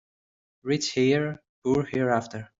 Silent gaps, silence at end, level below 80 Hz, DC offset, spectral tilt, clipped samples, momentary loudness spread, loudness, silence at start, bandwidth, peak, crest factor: 1.49-1.62 s; 0.15 s; -62 dBFS; under 0.1%; -5.5 dB/octave; under 0.1%; 10 LU; -26 LUFS; 0.65 s; 7.8 kHz; -8 dBFS; 18 dB